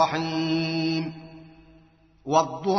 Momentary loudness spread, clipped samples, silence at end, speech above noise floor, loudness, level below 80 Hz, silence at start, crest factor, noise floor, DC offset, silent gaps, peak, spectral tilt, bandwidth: 19 LU; under 0.1%; 0 s; 33 dB; -25 LUFS; -62 dBFS; 0 s; 20 dB; -57 dBFS; under 0.1%; none; -6 dBFS; -4.5 dB/octave; 6.4 kHz